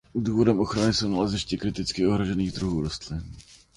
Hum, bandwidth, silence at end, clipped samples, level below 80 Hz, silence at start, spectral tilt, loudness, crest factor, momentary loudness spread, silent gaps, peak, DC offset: none; 11.5 kHz; 0.2 s; under 0.1%; -44 dBFS; 0.15 s; -5.5 dB/octave; -26 LUFS; 18 dB; 11 LU; none; -8 dBFS; under 0.1%